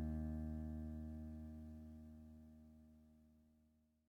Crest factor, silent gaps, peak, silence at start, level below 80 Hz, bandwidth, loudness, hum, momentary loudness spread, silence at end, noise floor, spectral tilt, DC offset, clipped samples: 14 dB; none; -36 dBFS; 0 s; -56 dBFS; 3.1 kHz; -51 LUFS; none; 19 LU; 0.65 s; -77 dBFS; -10 dB/octave; under 0.1%; under 0.1%